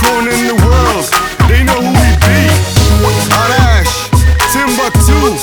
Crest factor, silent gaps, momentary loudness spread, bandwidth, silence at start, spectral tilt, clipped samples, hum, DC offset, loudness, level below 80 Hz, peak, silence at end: 8 dB; none; 3 LU; over 20 kHz; 0 s; -4.5 dB/octave; 0.4%; none; under 0.1%; -9 LUFS; -14 dBFS; 0 dBFS; 0 s